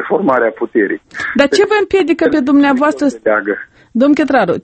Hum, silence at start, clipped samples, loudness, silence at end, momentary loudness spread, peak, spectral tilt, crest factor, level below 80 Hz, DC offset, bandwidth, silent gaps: none; 0 s; under 0.1%; -13 LUFS; 0.05 s; 8 LU; 0 dBFS; -5 dB/octave; 12 dB; -50 dBFS; under 0.1%; 8.8 kHz; none